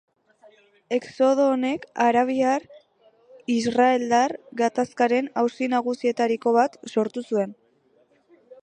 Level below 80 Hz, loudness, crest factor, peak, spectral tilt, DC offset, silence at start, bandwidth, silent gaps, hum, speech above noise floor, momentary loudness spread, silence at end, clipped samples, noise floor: -72 dBFS; -23 LUFS; 18 dB; -6 dBFS; -4.5 dB/octave; under 0.1%; 0.9 s; 9.8 kHz; none; none; 40 dB; 7 LU; 0.1 s; under 0.1%; -62 dBFS